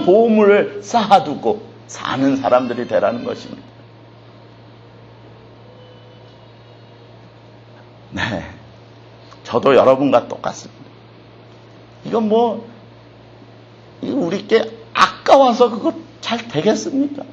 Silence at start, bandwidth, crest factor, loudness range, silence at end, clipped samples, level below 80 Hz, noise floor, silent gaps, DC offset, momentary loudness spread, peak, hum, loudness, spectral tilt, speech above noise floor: 0 s; 8.8 kHz; 18 dB; 15 LU; 0 s; under 0.1%; -56 dBFS; -42 dBFS; none; under 0.1%; 18 LU; 0 dBFS; none; -16 LUFS; -5.5 dB/octave; 27 dB